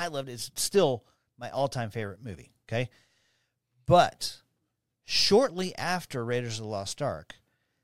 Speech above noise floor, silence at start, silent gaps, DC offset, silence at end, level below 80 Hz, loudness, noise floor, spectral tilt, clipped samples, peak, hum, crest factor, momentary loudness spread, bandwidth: 52 dB; 0 s; none; under 0.1%; 0.6 s; -58 dBFS; -28 LUFS; -80 dBFS; -4 dB/octave; under 0.1%; -8 dBFS; none; 22 dB; 16 LU; 16.5 kHz